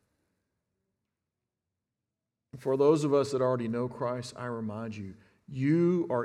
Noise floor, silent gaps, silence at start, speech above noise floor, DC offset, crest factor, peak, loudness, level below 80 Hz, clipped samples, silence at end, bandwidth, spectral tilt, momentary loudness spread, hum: -88 dBFS; none; 2.55 s; 59 dB; under 0.1%; 18 dB; -12 dBFS; -29 LUFS; -74 dBFS; under 0.1%; 0 s; 12 kHz; -7.5 dB/octave; 15 LU; none